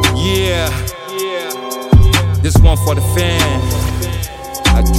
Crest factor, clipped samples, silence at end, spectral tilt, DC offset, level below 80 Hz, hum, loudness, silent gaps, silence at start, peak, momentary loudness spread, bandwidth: 12 dB; under 0.1%; 0 s; -5 dB/octave; under 0.1%; -18 dBFS; none; -14 LUFS; none; 0 s; 0 dBFS; 11 LU; 16.5 kHz